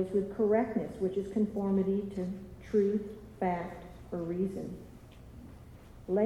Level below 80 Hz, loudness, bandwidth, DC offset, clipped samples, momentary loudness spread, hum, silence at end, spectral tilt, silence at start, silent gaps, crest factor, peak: -56 dBFS; -33 LUFS; 12 kHz; under 0.1%; under 0.1%; 22 LU; none; 0 s; -9 dB/octave; 0 s; none; 16 dB; -16 dBFS